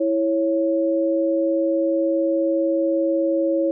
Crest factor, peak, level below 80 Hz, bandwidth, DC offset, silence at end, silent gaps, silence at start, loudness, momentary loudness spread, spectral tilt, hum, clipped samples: 6 dB; -14 dBFS; under -90 dBFS; 0.7 kHz; under 0.1%; 0 s; none; 0 s; -21 LUFS; 0 LU; -2 dB/octave; none; under 0.1%